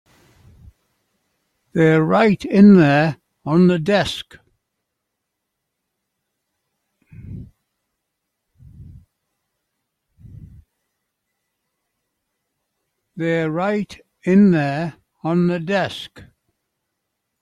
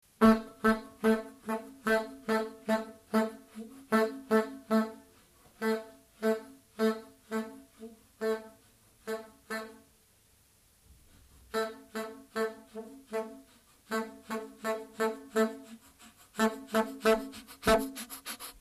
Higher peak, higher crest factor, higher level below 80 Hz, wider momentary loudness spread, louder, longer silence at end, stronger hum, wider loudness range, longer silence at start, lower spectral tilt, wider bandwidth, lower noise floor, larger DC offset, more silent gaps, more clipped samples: first, -2 dBFS vs -10 dBFS; about the same, 20 dB vs 22 dB; about the same, -54 dBFS vs -58 dBFS; about the same, 20 LU vs 18 LU; first, -17 LUFS vs -33 LUFS; first, 1.2 s vs 0.1 s; neither; about the same, 12 LU vs 10 LU; first, 1.75 s vs 0.2 s; first, -7.5 dB/octave vs -5 dB/octave; second, 10.5 kHz vs 15 kHz; first, -78 dBFS vs -65 dBFS; neither; neither; neither